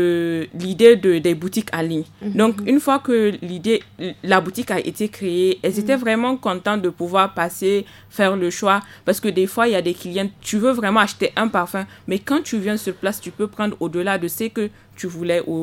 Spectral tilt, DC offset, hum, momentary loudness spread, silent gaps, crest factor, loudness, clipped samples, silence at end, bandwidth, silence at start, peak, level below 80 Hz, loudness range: -5 dB/octave; under 0.1%; none; 9 LU; none; 20 dB; -20 LUFS; under 0.1%; 0 s; 17 kHz; 0 s; 0 dBFS; -60 dBFS; 5 LU